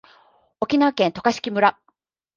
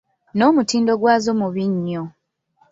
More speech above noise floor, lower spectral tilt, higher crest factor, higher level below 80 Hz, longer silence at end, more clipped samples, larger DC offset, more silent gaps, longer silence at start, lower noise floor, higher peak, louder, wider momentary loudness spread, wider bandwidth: about the same, 47 dB vs 44 dB; about the same, -5 dB/octave vs -5.5 dB/octave; about the same, 20 dB vs 16 dB; about the same, -62 dBFS vs -62 dBFS; about the same, 0.65 s vs 0.65 s; neither; neither; neither; first, 0.6 s vs 0.35 s; first, -67 dBFS vs -61 dBFS; about the same, -2 dBFS vs -2 dBFS; about the same, -21 LUFS vs -19 LUFS; second, 4 LU vs 12 LU; about the same, 7.4 kHz vs 7.8 kHz